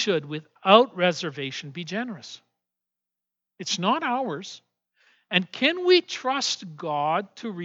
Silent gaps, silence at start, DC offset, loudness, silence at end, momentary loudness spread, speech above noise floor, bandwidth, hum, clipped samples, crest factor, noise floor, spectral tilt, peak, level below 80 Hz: none; 0 s; under 0.1%; -24 LUFS; 0 s; 17 LU; 62 dB; 8 kHz; none; under 0.1%; 24 dB; -87 dBFS; -4 dB/octave; -2 dBFS; -90 dBFS